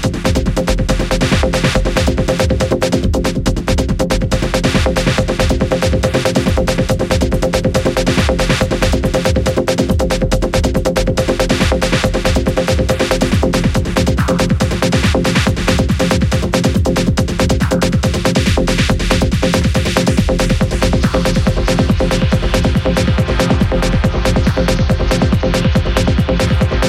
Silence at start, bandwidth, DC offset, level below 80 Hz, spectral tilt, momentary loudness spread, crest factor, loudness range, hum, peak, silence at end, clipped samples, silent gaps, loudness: 0 s; 16 kHz; under 0.1%; -20 dBFS; -5.5 dB/octave; 2 LU; 14 dB; 1 LU; none; 0 dBFS; 0 s; under 0.1%; none; -14 LUFS